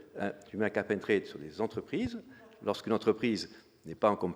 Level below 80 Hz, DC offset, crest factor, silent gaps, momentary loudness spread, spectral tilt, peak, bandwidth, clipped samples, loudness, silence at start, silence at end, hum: -66 dBFS; under 0.1%; 20 dB; none; 14 LU; -6 dB/octave; -12 dBFS; over 20 kHz; under 0.1%; -33 LUFS; 0 s; 0 s; none